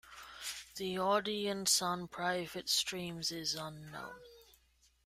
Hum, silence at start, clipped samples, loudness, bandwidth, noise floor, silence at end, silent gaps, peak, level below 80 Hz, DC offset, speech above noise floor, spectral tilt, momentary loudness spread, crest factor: none; 0.05 s; under 0.1%; -35 LUFS; 16 kHz; -71 dBFS; 0.65 s; none; -16 dBFS; -70 dBFS; under 0.1%; 34 dB; -2 dB/octave; 17 LU; 22 dB